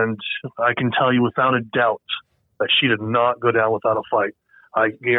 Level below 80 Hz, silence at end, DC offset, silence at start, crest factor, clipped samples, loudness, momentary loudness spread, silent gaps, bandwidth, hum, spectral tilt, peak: -64 dBFS; 0 s; under 0.1%; 0 s; 16 dB; under 0.1%; -20 LUFS; 9 LU; none; 4.1 kHz; none; -9 dB/octave; -4 dBFS